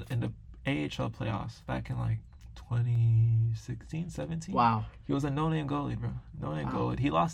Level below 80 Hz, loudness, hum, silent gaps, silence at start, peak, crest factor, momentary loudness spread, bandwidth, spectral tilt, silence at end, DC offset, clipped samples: -50 dBFS; -32 LUFS; none; none; 0 s; -14 dBFS; 18 dB; 11 LU; 9.2 kHz; -7.5 dB/octave; 0 s; under 0.1%; under 0.1%